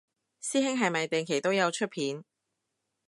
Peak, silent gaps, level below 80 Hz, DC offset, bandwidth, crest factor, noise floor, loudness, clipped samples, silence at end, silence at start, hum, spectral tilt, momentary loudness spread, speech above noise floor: -10 dBFS; none; -82 dBFS; under 0.1%; 11.5 kHz; 20 dB; -83 dBFS; -29 LUFS; under 0.1%; 0.85 s; 0.4 s; none; -3.5 dB/octave; 8 LU; 54 dB